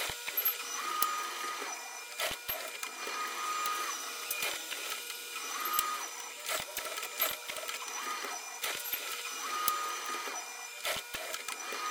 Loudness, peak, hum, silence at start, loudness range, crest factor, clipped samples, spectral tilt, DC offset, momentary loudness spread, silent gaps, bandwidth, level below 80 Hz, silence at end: -35 LUFS; -8 dBFS; none; 0 s; 1 LU; 28 dB; under 0.1%; 1 dB/octave; under 0.1%; 7 LU; none; 19 kHz; -72 dBFS; 0 s